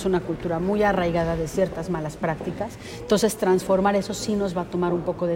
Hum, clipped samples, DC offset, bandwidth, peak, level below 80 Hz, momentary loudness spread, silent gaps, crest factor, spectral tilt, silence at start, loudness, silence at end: none; under 0.1%; under 0.1%; 16 kHz; -8 dBFS; -44 dBFS; 8 LU; none; 16 dB; -5.5 dB/octave; 0 s; -24 LUFS; 0 s